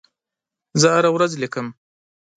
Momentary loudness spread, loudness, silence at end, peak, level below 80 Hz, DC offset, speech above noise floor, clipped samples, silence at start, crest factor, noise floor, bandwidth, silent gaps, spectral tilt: 14 LU; -19 LUFS; 0.65 s; -2 dBFS; -66 dBFS; under 0.1%; 68 dB; under 0.1%; 0.75 s; 20 dB; -86 dBFS; 9.4 kHz; none; -4 dB/octave